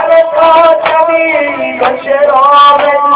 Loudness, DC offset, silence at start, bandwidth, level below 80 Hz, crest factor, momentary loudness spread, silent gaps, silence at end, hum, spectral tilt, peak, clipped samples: -7 LUFS; under 0.1%; 0 s; 4 kHz; -50 dBFS; 6 dB; 8 LU; none; 0 s; none; -6.5 dB/octave; 0 dBFS; 4%